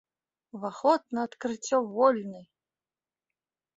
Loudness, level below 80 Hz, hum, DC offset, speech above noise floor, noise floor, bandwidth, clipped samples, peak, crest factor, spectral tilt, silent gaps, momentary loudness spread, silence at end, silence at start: -28 LUFS; -78 dBFS; none; under 0.1%; over 62 dB; under -90 dBFS; 8 kHz; under 0.1%; -10 dBFS; 22 dB; -4.5 dB/octave; none; 17 LU; 1.35 s; 0.55 s